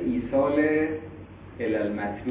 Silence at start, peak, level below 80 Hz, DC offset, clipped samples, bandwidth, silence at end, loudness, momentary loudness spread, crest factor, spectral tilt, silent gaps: 0 s; -10 dBFS; -50 dBFS; under 0.1%; under 0.1%; 4 kHz; 0 s; -26 LUFS; 20 LU; 16 dB; -11 dB/octave; none